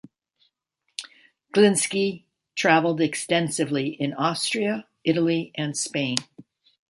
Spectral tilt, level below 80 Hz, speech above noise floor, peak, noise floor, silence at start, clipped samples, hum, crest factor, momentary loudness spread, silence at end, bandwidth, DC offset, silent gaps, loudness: -4 dB/octave; -70 dBFS; 54 dB; 0 dBFS; -76 dBFS; 1 s; under 0.1%; none; 24 dB; 14 LU; 0.5 s; 12 kHz; under 0.1%; none; -23 LUFS